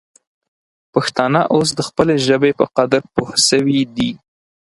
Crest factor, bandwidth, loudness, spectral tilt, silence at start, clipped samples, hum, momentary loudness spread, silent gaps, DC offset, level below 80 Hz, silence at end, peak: 16 dB; 11.5 kHz; -16 LUFS; -4 dB/octave; 0.95 s; under 0.1%; none; 7 LU; none; under 0.1%; -52 dBFS; 0.6 s; 0 dBFS